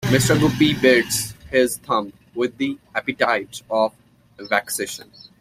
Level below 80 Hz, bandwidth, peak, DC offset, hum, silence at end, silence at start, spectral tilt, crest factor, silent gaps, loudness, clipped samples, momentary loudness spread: -50 dBFS; 16 kHz; -2 dBFS; under 0.1%; none; 0.35 s; 0 s; -4.5 dB/octave; 20 dB; none; -20 LUFS; under 0.1%; 10 LU